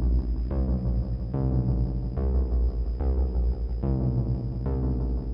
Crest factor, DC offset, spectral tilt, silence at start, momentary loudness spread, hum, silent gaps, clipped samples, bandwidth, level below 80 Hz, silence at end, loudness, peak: 12 dB; under 0.1%; -12.5 dB/octave; 0 s; 3 LU; none; none; under 0.1%; 5.2 kHz; -26 dBFS; 0 s; -28 LUFS; -12 dBFS